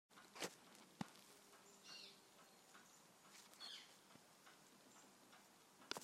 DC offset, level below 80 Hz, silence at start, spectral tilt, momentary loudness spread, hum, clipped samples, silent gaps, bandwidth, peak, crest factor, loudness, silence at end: under 0.1%; under -90 dBFS; 0.1 s; -2.5 dB/octave; 14 LU; none; under 0.1%; none; 16 kHz; -24 dBFS; 36 dB; -59 LUFS; 0 s